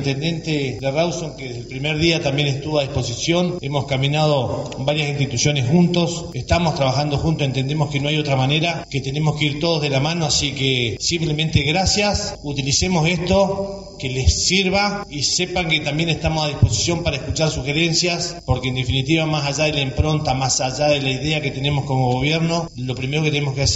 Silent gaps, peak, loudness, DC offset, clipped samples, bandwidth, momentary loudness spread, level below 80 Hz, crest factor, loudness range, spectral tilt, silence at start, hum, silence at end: none; -2 dBFS; -19 LUFS; under 0.1%; under 0.1%; 8.2 kHz; 6 LU; -36 dBFS; 16 dB; 2 LU; -4.5 dB/octave; 0 s; none; 0 s